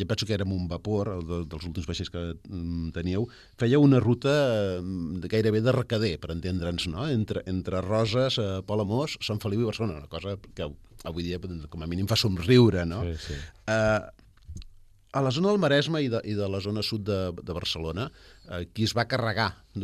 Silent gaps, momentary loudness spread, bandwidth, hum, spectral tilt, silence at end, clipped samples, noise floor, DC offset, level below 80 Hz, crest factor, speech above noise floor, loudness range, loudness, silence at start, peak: none; 14 LU; 13 kHz; none; -6 dB/octave; 0 s; under 0.1%; -51 dBFS; under 0.1%; -48 dBFS; 20 dB; 24 dB; 6 LU; -27 LUFS; 0 s; -8 dBFS